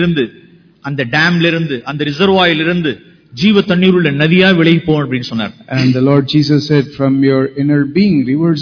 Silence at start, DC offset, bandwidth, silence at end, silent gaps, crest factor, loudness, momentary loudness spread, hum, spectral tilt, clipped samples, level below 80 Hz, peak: 0 s; under 0.1%; 5.4 kHz; 0 s; none; 12 dB; -12 LUFS; 10 LU; none; -7 dB/octave; 0.2%; -46 dBFS; 0 dBFS